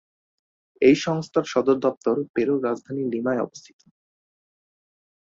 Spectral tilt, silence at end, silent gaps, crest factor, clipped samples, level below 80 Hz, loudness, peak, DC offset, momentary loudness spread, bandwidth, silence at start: -6 dB/octave; 1.6 s; 1.97-2.01 s, 2.29-2.34 s; 20 dB; under 0.1%; -66 dBFS; -23 LUFS; -6 dBFS; under 0.1%; 9 LU; 7.8 kHz; 0.8 s